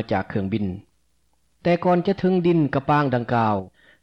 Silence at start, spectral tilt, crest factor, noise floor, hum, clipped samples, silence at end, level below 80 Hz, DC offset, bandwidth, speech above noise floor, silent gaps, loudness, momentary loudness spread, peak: 0 s; -9 dB/octave; 12 dB; -68 dBFS; none; under 0.1%; 0.35 s; -54 dBFS; under 0.1%; 6.2 kHz; 47 dB; none; -22 LUFS; 8 LU; -10 dBFS